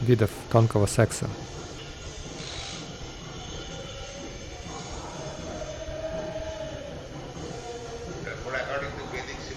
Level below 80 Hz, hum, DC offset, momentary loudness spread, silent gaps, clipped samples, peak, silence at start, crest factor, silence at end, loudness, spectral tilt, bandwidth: -46 dBFS; none; under 0.1%; 15 LU; none; under 0.1%; -6 dBFS; 0 s; 24 dB; 0 s; -31 LUFS; -5.5 dB/octave; 15 kHz